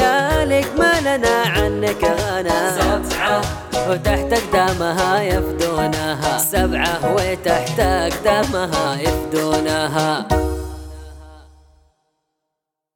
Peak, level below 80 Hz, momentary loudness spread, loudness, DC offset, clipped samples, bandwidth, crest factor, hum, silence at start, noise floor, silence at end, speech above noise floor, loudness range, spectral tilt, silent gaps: -2 dBFS; -30 dBFS; 4 LU; -18 LUFS; under 0.1%; under 0.1%; 19 kHz; 18 dB; none; 0 s; -80 dBFS; 1.5 s; 63 dB; 4 LU; -4.5 dB/octave; none